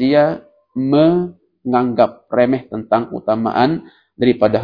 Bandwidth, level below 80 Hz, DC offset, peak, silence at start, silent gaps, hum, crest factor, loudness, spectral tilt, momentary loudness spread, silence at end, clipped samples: 5.2 kHz; -54 dBFS; under 0.1%; 0 dBFS; 0 s; none; none; 16 dB; -17 LUFS; -9.5 dB/octave; 12 LU; 0 s; under 0.1%